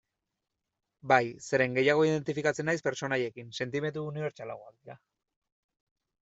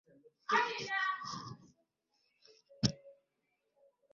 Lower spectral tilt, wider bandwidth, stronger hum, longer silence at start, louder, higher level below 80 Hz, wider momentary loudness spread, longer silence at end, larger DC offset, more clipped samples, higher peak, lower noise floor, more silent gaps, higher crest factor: first, -5.5 dB/octave vs -2.5 dB/octave; first, 8.2 kHz vs 7.4 kHz; neither; first, 1.05 s vs 0.5 s; first, -29 LUFS vs -36 LUFS; about the same, -72 dBFS vs -68 dBFS; second, 13 LU vs 19 LU; first, 1.3 s vs 1 s; neither; neither; first, -6 dBFS vs -14 dBFS; about the same, -86 dBFS vs -83 dBFS; neither; about the same, 26 dB vs 28 dB